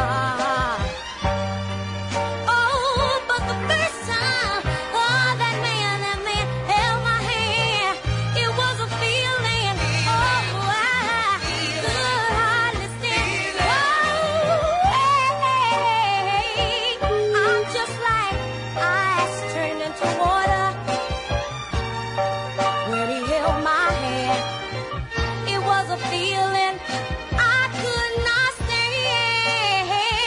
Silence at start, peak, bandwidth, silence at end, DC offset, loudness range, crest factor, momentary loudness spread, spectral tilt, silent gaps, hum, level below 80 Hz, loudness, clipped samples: 0 s; -8 dBFS; 11 kHz; 0 s; under 0.1%; 3 LU; 14 dB; 7 LU; -3.5 dB/octave; none; none; -38 dBFS; -21 LUFS; under 0.1%